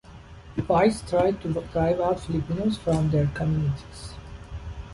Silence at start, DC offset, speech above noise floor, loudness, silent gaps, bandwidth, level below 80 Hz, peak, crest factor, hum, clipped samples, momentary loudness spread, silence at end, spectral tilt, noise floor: 0.05 s; under 0.1%; 21 dB; -25 LUFS; none; 11.5 kHz; -42 dBFS; -6 dBFS; 18 dB; none; under 0.1%; 18 LU; 0 s; -7.5 dB/octave; -45 dBFS